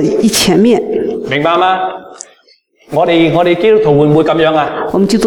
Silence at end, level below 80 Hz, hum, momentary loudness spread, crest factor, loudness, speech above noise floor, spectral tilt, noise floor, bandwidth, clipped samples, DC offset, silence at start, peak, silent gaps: 0 s; -44 dBFS; none; 8 LU; 10 dB; -11 LUFS; 40 dB; -5 dB/octave; -49 dBFS; 18.5 kHz; under 0.1%; under 0.1%; 0 s; 0 dBFS; none